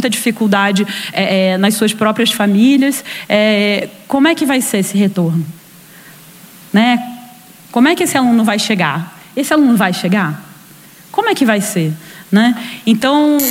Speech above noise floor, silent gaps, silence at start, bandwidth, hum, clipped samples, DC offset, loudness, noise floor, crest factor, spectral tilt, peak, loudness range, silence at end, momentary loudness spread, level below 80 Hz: 27 dB; none; 0 s; 16.5 kHz; none; under 0.1%; under 0.1%; -13 LUFS; -40 dBFS; 14 dB; -4.5 dB/octave; 0 dBFS; 3 LU; 0 s; 9 LU; -60 dBFS